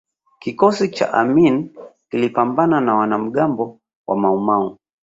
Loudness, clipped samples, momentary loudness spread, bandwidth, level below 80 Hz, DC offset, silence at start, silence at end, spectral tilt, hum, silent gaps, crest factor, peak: -18 LUFS; under 0.1%; 13 LU; 7.8 kHz; -60 dBFS; under 0.1%; 0.45 s; 0.3 s; -7 dB/octave; none; 3.96-4.04 s; 16 dB; -2 dBFS